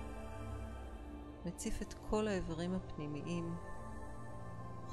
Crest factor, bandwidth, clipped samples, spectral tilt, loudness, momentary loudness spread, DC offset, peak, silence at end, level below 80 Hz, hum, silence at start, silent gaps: 20 dB; 13 kHz; under 0.1%; -6 dB/octave; -44 LUFS; 12 LU; under 0.1%; -22 dBFS; 0 s; -50 dBFS; none; 0 s; none